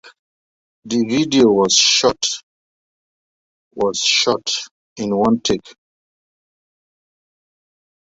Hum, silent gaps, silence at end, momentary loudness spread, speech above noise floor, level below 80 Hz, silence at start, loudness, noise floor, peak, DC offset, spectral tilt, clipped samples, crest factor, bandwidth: none; 0.19-0.82 s, 2.43-3.71 s, 4.71-4.96 s; 2.4 s; 12 LU; over 74 dB; -54 dBFS; 0.05 s; -16 LUFS; under -90 dBFS; 0 dBFS; under 0.1%; -2.5 dB/octave; under 0.1%; 20 dB; 8 kHz